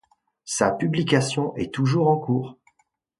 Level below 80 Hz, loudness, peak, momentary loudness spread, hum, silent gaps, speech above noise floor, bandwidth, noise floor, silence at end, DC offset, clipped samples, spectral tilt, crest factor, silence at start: -58 dBFS; -23 LUFS; -6 dBFS; 7 LU; none; none; 47 dB; 11.5 kHz; -69 dBFS; 0.65 s; under 0.1%; under 0.1%; -5.5 dB/octave; 18 dB; 0.45 s